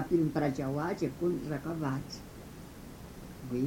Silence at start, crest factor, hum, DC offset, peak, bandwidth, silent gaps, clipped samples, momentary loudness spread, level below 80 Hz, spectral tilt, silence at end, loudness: 0 s; 18 dB; none; under 0.1%; -16 dBFS; 17 kHz; none; under 0.1%; 18 LU; -54 dBFS; -7 dB/octave; 0 s; -34 LUFS